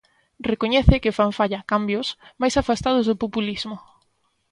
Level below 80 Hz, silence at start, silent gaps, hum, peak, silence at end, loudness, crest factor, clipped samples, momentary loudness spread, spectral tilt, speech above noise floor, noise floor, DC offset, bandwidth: -32 dBFS; 0.4 s; none; none; 0 dBFS; 0.7 s; -22 LUFS; 22 dB; under 0.1%; 12 LU; -6 dB/octave; 46 dB; -68 dBFS; under 0.1%; 11 kHz